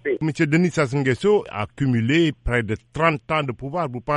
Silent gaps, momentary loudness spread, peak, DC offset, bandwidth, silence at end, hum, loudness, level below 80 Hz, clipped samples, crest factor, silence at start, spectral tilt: none; 8 LU; -4 dBFS; under 0.1%; 11 kHz; 0 s; none; -21 LUFS; -42 dBFS; under 0.1%; 18 dB; 0.05 s; -6.5 dB/octave